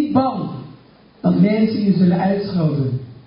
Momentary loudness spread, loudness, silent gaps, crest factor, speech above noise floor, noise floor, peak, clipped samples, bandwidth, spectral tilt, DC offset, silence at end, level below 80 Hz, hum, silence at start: 10 LU; -18 LUFS; none; 14 dB; 30 dB; -47 dBFS; -4 dBFS; under 0.1%; 5.4 kHz; -13 dB/octave; under 0.1%; 0.15 s; -52 dBFS; none; 0 s